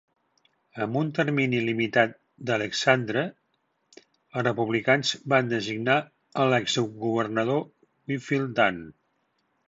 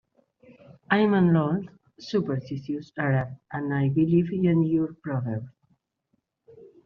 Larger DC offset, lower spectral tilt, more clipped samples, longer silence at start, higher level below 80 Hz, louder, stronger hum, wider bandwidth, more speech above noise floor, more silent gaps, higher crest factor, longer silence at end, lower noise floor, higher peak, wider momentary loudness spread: neither; second, -5 dB/octave vs -7.5 dB/octave; neither; about the same, 0.75 s vs 0.7 s; second, -68 dBFS vs -62 dBFS; about the same, -25 LUFS vs -25 LUFS; neither; first, 8 kHz vs 6.6 kHz; about the same, 48 dB vs 50 dB; neither; about the same, 20 dB vs 18 dB; first, 0.75 s vs 0.2 s; about the same, -73 dBFS vs -75 dBFS; about the same, -6 dBFS vs -8 dBFS; about the same, 11 LU vs 13 LU